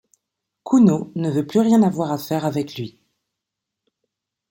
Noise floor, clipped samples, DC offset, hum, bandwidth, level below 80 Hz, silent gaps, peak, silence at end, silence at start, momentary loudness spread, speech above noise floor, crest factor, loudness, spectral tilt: -83 dBFS; under 0.1%; under 0.1%; none; 16.5 kHz; -64 dBFS; none; -4 dBFS; 1.6 s; 0.65 s; 16 LU; 65 dB; 18 dB; -19 LUFS; -7.5 dB/octave